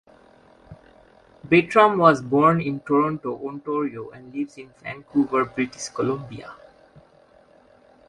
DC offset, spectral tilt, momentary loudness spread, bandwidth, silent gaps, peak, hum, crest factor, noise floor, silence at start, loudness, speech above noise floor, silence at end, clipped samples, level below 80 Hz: under 0.1%; -6 dB/octave; 20 LU; 11.5 kHz; none; -2 dBFS; none; 22 dB; -54 dBFS; 0.7 s; -21 LUFS; 33 dB; 1.55 s; under 0.1%; -60 dBFS